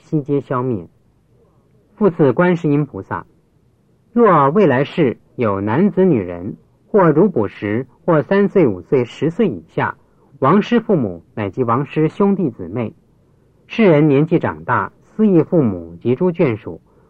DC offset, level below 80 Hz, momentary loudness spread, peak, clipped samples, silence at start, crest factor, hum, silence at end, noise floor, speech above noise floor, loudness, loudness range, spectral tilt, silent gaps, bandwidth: under 0.1%; -56 dBFS; 12 LU; -2 dBFS; under 0.1%; 0.1 s; 14 dB; none; 0.3 s; -56 dBFS; 41 dB; -16 LUFS; 3 LU; -9.5 dB/octave; none; 7.4 kHz